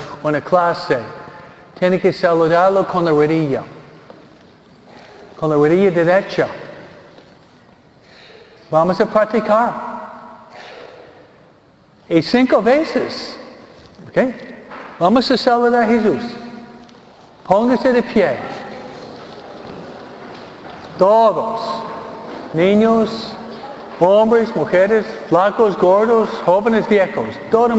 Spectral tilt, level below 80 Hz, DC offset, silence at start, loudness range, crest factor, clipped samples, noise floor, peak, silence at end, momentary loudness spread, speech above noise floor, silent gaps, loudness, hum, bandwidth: -7 dB/octave; -54 dBFS; under 0.1%; 0 s; 5 LU; 16 dB; under 0.1%; -49 dBFS; 0 dBFS; 0 s; 22 LU; 35 dB; none; -15 LUFS; none; 8.2 kHz